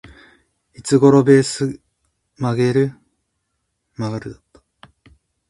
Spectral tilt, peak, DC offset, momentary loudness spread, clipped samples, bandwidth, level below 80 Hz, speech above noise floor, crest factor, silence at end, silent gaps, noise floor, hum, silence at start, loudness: -6.5 dB/octave; 0 dBFS; under 0.1%; 19 LU; under 0.1%; 11.5 kHz; -56 dBFS; 58 dB; 20 dB; 1.15 s; none; -73 dBFS; none; 0.8 s; -17 LUFS